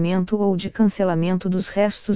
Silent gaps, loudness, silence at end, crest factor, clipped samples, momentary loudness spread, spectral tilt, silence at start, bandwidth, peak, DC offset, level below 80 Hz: none; -21 LUFS; 0 s; 14 dB; under 0.1%; 3 LU; -12 dB/octave; 0 s; 4 kHz; -6 dBFS; under 0.1%; -52 dBFS